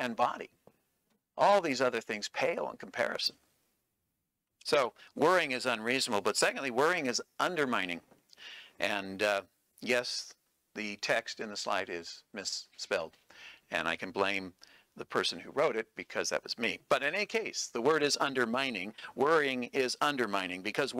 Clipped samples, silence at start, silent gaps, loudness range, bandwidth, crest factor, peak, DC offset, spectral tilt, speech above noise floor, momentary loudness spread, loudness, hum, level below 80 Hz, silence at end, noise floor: under 0.1%; 0 s; none; 5 LU; 16 kHz; 18 dB; -14 dBFS; under 0.1%; -2.5 dB/octave; 52 dB; 14 LU; -32 LUFS; none; -78 dBFS; 0 s; -84 dBFS